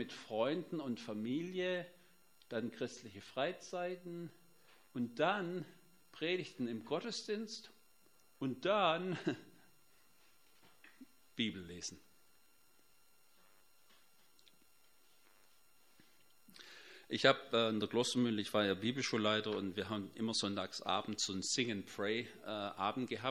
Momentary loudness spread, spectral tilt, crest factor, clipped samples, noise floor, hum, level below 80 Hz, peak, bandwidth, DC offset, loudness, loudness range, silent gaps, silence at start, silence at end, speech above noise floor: 13 LU; -4 dB/octave; 28 dB; under 0.1%; -72 dBFS; none; -82 dBFS; -12 dBFS; 16 kHz; under 0.1%; -39 LUFS; 12 LU; none; 0 s; 0 s; 33 dB